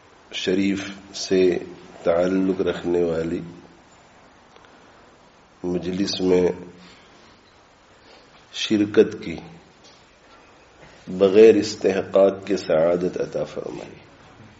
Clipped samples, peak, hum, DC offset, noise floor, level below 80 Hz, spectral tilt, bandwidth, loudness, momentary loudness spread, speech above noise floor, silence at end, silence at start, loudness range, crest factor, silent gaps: under 0.1%; -2 dBFS; none; under 0.1%; -53 dBFS; -58 dBFS; -5 dB/octave; 8 kHz; -21 LUFS; 16 LU; 33 dB; 0.65 s; 0.3 s; 8 LU; 20 dB; none